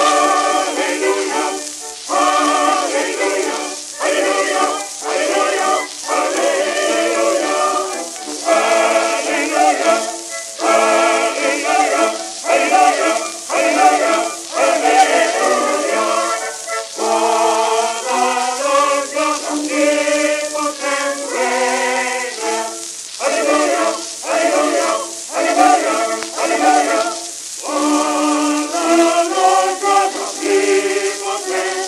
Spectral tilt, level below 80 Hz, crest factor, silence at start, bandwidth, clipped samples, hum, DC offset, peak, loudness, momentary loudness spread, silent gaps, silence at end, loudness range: 0 dB/octave; -66 dBFS; 16 dB; 0 s; 14 kHz; under 0.1%; none; under 0.1%; 0 dBFS; -16 LUFS; 8 LU; none; 0 s; 3 LU